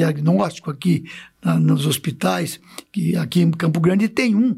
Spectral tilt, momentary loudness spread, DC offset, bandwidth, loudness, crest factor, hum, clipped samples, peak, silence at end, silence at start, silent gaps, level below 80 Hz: -6.5 dB/octave; 9 LU; under 0.1%; 15 kHz; -19 LUFS; 12 dB; none; under 0.1%; -6 dBFS; 0 s; 0 s; none; -62 dBFS